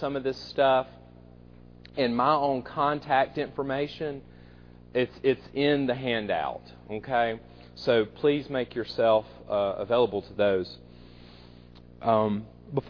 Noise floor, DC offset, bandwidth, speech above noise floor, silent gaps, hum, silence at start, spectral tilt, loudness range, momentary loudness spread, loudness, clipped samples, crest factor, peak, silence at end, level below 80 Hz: -50 dBFS; under 0.1%; 5.4 kHz; 23 dB; none; 60 Hz at -50 dBFS; 0 s; -7.5 dB/octave; 2 LU; 12 LU; -27 LUFS; under 0.1%; 20 dB; -8 dBFS; 0 s; -56 dBFS